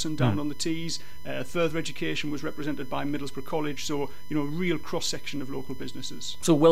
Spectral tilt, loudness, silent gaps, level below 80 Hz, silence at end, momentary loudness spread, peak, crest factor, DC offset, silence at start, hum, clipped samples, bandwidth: -5 dB/octave; -30 LUFS; none; -56 dBFS; 0 s; 9 LU; -8 dBFS; 20 dB; 3%; 0 s; none; under 0.1%; 16 kHz